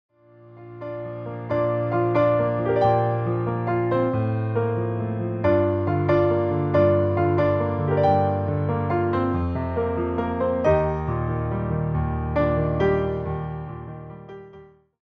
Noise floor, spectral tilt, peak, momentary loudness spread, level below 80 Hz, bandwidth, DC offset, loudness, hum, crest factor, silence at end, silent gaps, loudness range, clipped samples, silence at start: -49 dBFS; -10 dB/octave; -8 dBFS; 13 LU; -44 dBFS; 6.2 kHz; under 0.1%; -23 LUFS; none; 16 dB; 0.4 s; none; 4 LU; under 0.1%; 0.45 s